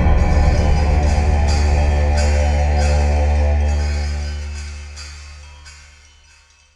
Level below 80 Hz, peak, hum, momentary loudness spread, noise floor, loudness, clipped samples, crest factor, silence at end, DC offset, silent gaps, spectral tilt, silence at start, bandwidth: -18 dBFS; -2 dBFS; none; 17 LU; -50 dBFS; -17 LUFS; under 0.1%; 14 dB; 1 s; under 0.1%; none; -6 dB/octave; 0 s; 10 kHz